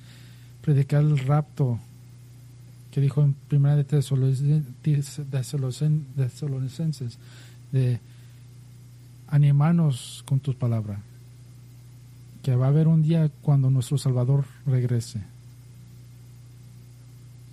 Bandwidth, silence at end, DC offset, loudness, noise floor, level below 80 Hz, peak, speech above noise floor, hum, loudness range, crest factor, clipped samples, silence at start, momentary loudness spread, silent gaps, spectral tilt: 12.5 kHz; 0 s; under 0.1%; -24 LUFS; -46 dBFS; -58 dBFS; -10 dBFS; 24 dB; 60 Hz at -50 dBFS; 5 LU; 14 dB; under 0.1%; 0.05 s; 13 LU; none; -8 dB/octave